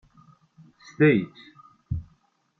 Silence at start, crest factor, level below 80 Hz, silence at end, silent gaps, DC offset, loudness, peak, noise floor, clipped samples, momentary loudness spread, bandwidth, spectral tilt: 1 s; 20 dB; -50 dBFS; 0.55 s; none; under 0.1%; -24 LUFS; -8 dBFS; -66 dBFS; under 0.1%; 15 LU; 6.4 kHz; -8.5 dB/octave